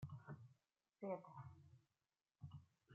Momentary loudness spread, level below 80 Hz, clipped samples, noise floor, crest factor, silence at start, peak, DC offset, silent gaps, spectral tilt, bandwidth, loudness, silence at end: 15 LU; -82 dBFS; under 0.1%; under -90 dBFS; 22 dB; 0 s; -34 dBFS; under 0.1%; none; -8.5 dB/octave; 7.2 kHz; -56 LUFS; 0 s